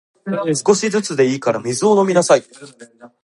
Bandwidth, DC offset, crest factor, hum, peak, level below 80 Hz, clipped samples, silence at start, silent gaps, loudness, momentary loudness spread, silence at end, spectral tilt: 11.5 kHz; under 0.1%; 16 dB; none; 0 dBFS; -64 dBFS; under 0.1%; 0.25 s; none; -16 LUFS; 6 LU; 0.15 s; -4.5 dB/octave